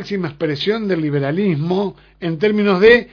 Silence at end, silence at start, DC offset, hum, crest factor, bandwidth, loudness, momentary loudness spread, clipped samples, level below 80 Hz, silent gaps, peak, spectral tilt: 0.05 s; 0 s; under 0.1%; none; 16 dB; 5.4 kHz; -17 LUFS; 13 LU; under 0.1%; -48 dBFS; none; 0 dBFS; -7.5 dB/octave